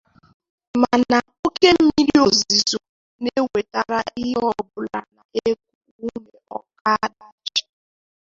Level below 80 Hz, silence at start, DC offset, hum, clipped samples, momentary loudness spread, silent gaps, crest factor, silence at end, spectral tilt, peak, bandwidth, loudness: -54 dBFS; 0.75 s; under 0.1%; none; under 0.1%; 17 LU; 1.39-1.43 s, 2.89-3.19 s, 5.25-5.29 s, 5.75-5.81 s, 5.91-5.99 s, 6.81-6.85 s, 7.32-7.38 s; 20 dB; 0.75 s; -3 dB/octave; -2 dBFS; 7.6 kHz; -20 LUFS